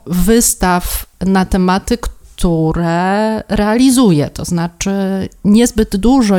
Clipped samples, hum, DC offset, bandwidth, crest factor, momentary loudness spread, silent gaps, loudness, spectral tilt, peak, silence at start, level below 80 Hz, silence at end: under 0.1%; none; under 0.1%; 19.5 kHz; 12 dB; 8 LU; none; -13 LUFS; -5 dB/octave; 0 dBFS; 0.05 s; -26 dBFS; 0 s